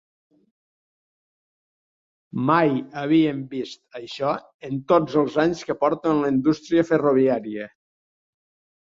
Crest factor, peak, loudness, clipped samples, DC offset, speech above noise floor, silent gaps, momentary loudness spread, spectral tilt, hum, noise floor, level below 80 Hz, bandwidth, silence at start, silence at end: 20 dB; -4 dBFS; -22 LUFS; under 0.1%; under 0.1%; over 69 dB; 4.54-4.59 s; 14 LU; -7 dB/octave; none; under -90 dBFS; -62 dBFS; 7.6 kHz; 2.35 s; 1.25 s